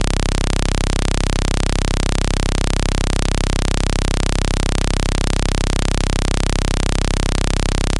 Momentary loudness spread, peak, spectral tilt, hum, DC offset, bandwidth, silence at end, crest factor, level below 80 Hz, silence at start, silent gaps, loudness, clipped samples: 0 LU; -2 dBFS; -4.5 dB/octave; none; 0.5%; 11.5 kHz; 0 s; 14 dB; -18 dBFS; 0 s; none; -20 LUFS; under 0.1%